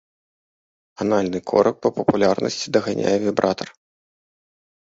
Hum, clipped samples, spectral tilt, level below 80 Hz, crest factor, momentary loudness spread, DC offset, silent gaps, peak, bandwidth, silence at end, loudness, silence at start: none; under 0.1%; -5.5 dB/octave; -56 dBFS; 22 dB; 5 LU; under 0.1%; none; 0 dBFS; 8 kHz; 1.25 s; -21 LUFS; 1 s